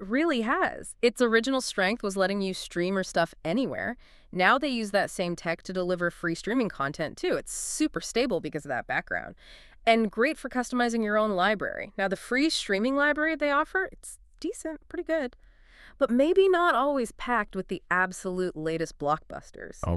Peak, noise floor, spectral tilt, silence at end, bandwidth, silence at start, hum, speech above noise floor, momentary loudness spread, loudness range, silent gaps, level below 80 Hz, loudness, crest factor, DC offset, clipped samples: -8 dBFS; -53 dBFS; -4 dB/octave; 0 s; 13.5 kHz; 0 s; none; 26 dB; 11 LU; 3 LU; none; -52 dBFS; -27 LUFS; 20 dB; under 0.1%; under 0.1%